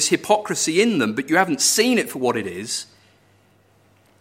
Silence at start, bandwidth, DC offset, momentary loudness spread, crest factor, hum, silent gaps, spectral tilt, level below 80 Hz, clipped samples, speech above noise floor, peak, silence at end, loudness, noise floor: 0 s; 16.5 kHz; under 0.1%; 11 LU; 20 dB; none; none; -2.5 dB/octave; -68 dBFS; under 0.1%; 37 dB; -2 dBFS; 1.35 s; -19 LUFS; -57 dBFS